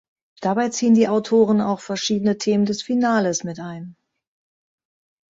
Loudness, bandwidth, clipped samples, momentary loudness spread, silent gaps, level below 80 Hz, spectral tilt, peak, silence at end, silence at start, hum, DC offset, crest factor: -20 LUFS; 7.8 kHz; under 0.1%; 14 LU; none; -64 dBFS; -5 dB/octave; -4 dBFS; 1.4 s; 0.4 s; none; under 0.1%; 16 dB